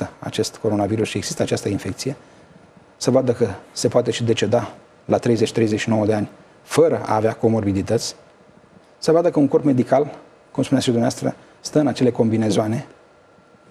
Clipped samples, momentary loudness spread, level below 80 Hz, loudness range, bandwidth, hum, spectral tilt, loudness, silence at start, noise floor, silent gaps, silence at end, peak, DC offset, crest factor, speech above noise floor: under 0.1%; 10 LU; -58 dBFS; 3 LU; 14 kHz; none; -6 dB/octave; -20 LUFS; 0 s; -51 dBFS; none; 0.85 s; -2 dBFS; under 0.1%; 18 dB; 32 dB